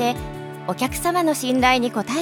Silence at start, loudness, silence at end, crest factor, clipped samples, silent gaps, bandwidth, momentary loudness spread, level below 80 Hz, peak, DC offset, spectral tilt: 0 s; -21 LUFS; 0 s; 18 dB; under 0.1%; none; 19.5 kHz; 13 LU; -42 dBFS; -4 dBFS; under 0.1%; -4 dB/octave